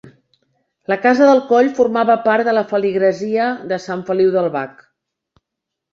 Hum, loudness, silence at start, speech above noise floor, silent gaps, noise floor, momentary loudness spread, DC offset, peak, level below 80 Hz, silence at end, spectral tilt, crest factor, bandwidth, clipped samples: none; -16 LUFS; 0.05 s; 66 dB; none; -81 dBFS; 11 LU; under 0.1%; -2 dBFS; -64 dBFS; 1.2 s; -6 dB/octave; 16 dB; 7.6 kHz; under 0.1%